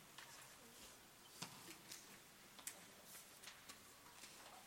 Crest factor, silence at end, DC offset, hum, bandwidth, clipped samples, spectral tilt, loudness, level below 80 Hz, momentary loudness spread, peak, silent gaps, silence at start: 28 dB; 0 s; under 0.1%; none; 16.5 kHz; under 0.1%; -1.5 dB/octave; -57 LUFS; -84 dBFS; 7 LU; -32 dBFS; none; 0 s